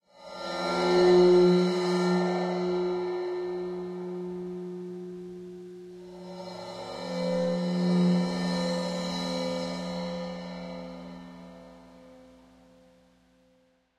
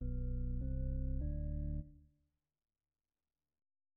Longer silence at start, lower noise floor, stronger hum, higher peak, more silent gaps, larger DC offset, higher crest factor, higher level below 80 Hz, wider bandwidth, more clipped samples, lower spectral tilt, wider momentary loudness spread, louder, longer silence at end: first, 0.2 s vs 0 s; second, -66 dBFS vs under -90 dBFS; neither; first, -10 dBFS vs -30 dBFS; neither; neither; first, 18 dB vs 12 dB; second, -64 dBFS vs -42 dBFS; first, 10.5 kHz vs 1.8 kHz; neither; second, -6.5 dB/octave vs -14 dB/octave; first, 21 LU vs 4 LU; first, -28 LUFS vs -42 LUFS; second, 1.7 s vs 2 s